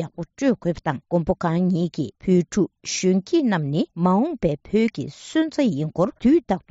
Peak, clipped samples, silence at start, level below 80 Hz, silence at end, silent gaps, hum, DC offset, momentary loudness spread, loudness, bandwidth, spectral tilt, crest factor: -6 dBFS; under 0.1%; 0 s; -50 dBFS; 0.1 s; none; none; under 0.1%; 6 LU; -22 LUFS; 8 kHz; -6.5 dB/octave; 14 dB